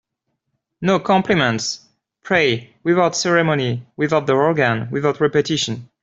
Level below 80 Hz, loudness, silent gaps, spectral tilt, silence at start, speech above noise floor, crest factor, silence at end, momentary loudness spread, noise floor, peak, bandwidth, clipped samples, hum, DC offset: -56 dBFS; -18 LUFS; none; -4.5 dB/octave; 0.8 s; 57 dB; 16 dB; 0.15 s; 7 LU; -75 dBFS; -2 dBFS; 8 kHz; under 0.1%; none; under 0.1%